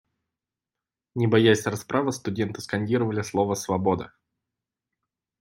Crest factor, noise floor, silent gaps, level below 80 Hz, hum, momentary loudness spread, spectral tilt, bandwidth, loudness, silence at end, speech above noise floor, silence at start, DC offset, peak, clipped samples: 20 dB; -89 dBFS; none; -64 dBFS; none; 10 LU; -5.5 dB/octave; 16 kHz; -25 LUFS; 1.35 s; 65 dB; 1.15 s; under 0.1%; -6 dBFS; under 0.1%